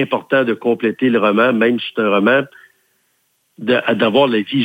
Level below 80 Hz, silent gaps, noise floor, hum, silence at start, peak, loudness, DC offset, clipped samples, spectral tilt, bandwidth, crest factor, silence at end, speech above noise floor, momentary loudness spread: -64 dBFS; none; -64 dBFS; none; 0 s; -2 dBFS; -15 LUFS; under 0.1%; under 0.1%; -7 dB/octave; 16.5 kHz; 16 dB; 0 s; 49 dB; 5 LU